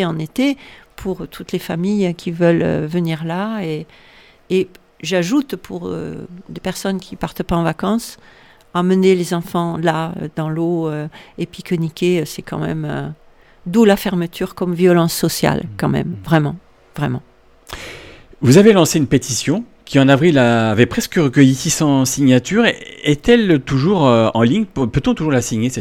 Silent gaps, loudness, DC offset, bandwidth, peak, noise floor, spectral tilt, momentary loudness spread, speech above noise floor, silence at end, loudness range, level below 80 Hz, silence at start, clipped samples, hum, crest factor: none; -16 LUFS; under 0.1%; 17.5 kHz; 0 dBFS; -38 dBFS; -5.5 dB/octave; 15 LU; 22 dB; 0 s; 8 LU; -42 dBFS; 0 s; under 0.1%; none; 16 dB